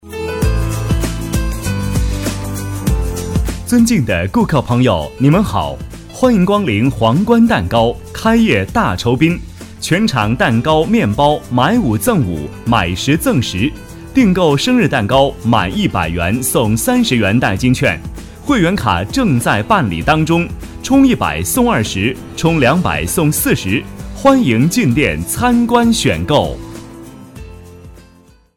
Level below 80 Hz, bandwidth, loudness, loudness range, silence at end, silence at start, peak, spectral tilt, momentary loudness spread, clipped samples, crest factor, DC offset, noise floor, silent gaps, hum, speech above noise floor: -28 dBFS; 17 kHz; -14 LUFS; 2 LU; 0.55 s; 0.05 s; 0 dBFS; -5.5 dB/octave; 9 LU; under 0.1%; 14 dB; under 0.1%; -46 dBFS; none; none; 33 dB